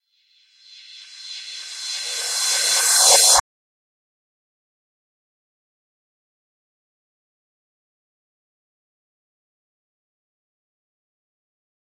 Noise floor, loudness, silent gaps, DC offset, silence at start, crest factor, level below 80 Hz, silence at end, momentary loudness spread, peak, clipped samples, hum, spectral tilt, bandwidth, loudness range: -61 dBFS; -15 LUFS; none; under 0.1%; 0.9 s; 26 dB; -62 dBFS; 8.6 s; 22 LU; 0 dBFS; under 0.1%; none; 3.5 dB/octave; 16 kHz; 3 LU